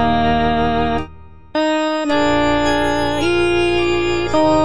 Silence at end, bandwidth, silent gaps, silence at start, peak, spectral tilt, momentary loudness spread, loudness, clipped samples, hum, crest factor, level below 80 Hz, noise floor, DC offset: 0 s; 10.5 kHz; none; 0 s; -4 dBFS; -5.5 dB/octave; 5 LU; -17 LUFS; under 0.1%; none; 10 dB; -34 dBFS; -39 dBFS; 4%